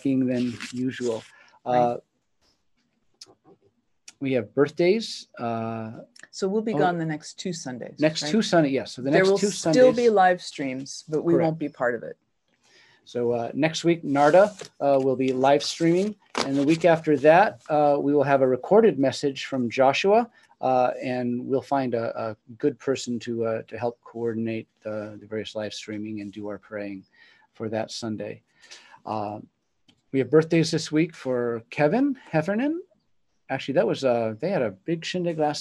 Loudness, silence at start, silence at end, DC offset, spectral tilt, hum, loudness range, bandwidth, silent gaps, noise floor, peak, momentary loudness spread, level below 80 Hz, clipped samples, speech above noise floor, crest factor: -24 LUFS; 0.05 s; 0 s; under 0.1%; -5.5 dB/octave; none; 12 LU; 12 kHz; none; -73 dBFS; -4 dBFS; 15 LU; -70 dBFS; under 0.1%; 49 dB; 20 dB